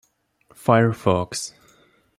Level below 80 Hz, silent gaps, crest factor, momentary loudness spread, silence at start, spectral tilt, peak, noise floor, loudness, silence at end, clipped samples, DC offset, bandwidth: -58 dBFS; none; 22 dB; 12 LU; 0.65 s; -5.5 dB/octave; -2 dBFS; -59 dBFS; -21 LUFS; 0.7 s; under 0.1%; under 0.1%; 15.5 kHz